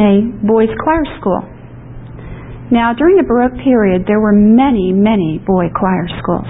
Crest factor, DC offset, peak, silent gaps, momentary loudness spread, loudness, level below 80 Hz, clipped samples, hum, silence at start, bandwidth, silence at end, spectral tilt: 12 dB; 0.5%; 0 dBFS; none; 21 LU; -12 LUFS; -34 dBFS; under 0.1%; none; 0 s; 4 kHz; 0 s; -13 dB/octave